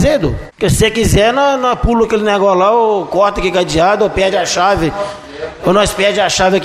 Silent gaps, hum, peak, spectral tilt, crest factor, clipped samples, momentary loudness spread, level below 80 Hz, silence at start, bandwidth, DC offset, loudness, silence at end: none; none; 0 dBFS; -4.5 dB/octave; 12 dB; under 0.1%; 7 LU; -28 dBFS; 0 s; 15 kHz; under 0.1%; -12 LUFS; 0 s